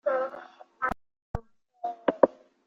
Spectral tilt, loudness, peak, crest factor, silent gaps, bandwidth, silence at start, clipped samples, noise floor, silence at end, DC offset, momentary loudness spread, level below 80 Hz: -8 dB/octave; -30 LUFS; -4 dBFS; 28 dB; 1.22-1.34 s; 7 kHz; 0.05 s; under 0.1%; -47 dBFS; 0.4 s; under 0.1%; 16 LU; -50 dBFS